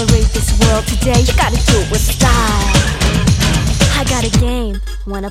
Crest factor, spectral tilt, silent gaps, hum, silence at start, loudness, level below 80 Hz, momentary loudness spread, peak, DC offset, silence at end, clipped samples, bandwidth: 12 dB; -4.5 dB/octave; none; none; 0 s; -13 LUFS; -16 dBFS; 6 LU; 0 dBFS; under 0.1%; 0 s; under 0.1%; 16 kHz